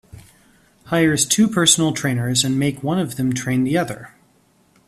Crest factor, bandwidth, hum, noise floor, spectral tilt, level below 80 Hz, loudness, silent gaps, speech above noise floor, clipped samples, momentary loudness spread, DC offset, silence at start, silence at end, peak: 20 dB; 15 kHz; none; -58 dBFS; -3.5 dB/octave; -54 dBFS; -18 LUFS; none; 39 dB; under 0.1%; 8 LU; under 0.1%; 0.15 s; 0.8 s; 0 dBFS